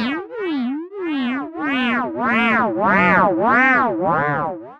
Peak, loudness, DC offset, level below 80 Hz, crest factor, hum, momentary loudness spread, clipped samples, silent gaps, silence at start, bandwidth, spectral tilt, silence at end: -6 dBFS; -18 LUFS; under 0.1%; -52 dBFS; 14 dB; none; 11 LU; under 0.1%; none; 0 s; 7.4 kHz; -7 dB/octave; 0.05 s